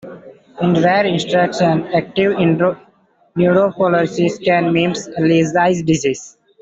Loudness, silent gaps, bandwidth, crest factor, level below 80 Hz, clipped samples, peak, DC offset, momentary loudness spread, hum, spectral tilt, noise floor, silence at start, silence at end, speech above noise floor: -15 LUFS; none; 8 kHz; 14 dB; -54 dBFS; under 0.1%; -2 dBFS; under 0.1%; 6 LU; none; -6 dB/octave; -55 dBFS; 0.05 s; 0.3 s; 40 dB